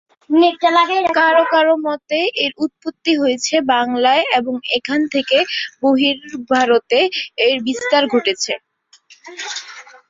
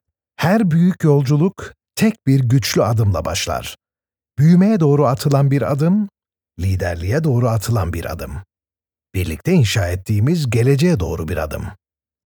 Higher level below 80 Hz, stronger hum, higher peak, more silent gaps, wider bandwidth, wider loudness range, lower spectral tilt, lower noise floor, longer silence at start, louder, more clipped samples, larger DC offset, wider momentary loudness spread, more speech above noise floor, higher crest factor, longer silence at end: second, -64 dBFS vs -38 dBFS; neither; about the same, -2 dBFS vs -2 dBFS; neither; second, 7.8 kHz vs over 20 kHz; about the same, 2 LU vs 4 LU; second, -2 dB/octave vs -6.5 dB/octave; second, -50 dBFS vs under -90 dBFS; about the same, 0.3 s vs 0.4 s; about the same, -16 LUFS vs -17 LUFS; neither; neither; second, 10 LU vs 13 LU; second, 34 dB vs over 74 dB; about the same, 14 dB vs 16 dB; second, 0.25 s vs 0.65 s